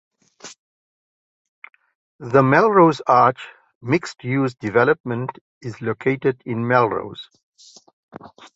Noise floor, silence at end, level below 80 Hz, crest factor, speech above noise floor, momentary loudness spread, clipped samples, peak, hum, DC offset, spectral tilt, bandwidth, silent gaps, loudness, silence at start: under -90 dBFS; 0.3 s; -60 dBFS; 20 dB; over 71 dB; 23 LU; under 0.1%; -2 dBFS; none; under 0.1%; -7 dB/octave; 8 kHz; 0.58-1.62 s, 1.95-2.19 s, 3.75-3.81 s, 5.00-5.04 s, 5.41-5.61 s, 7.43-7.52 s, 7.93-8.09 s; -19 LUFS; 0.45 s